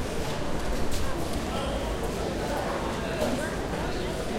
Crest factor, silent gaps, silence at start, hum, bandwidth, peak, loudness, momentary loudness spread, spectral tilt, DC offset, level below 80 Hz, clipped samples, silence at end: 14 dB; none; 0 s; none; 16 kHz; -14 dBFS; -30 LUFS; 3 LU; -5 dB/octave; under 0.1%; -36 dBFS; under 0.1%; 0 s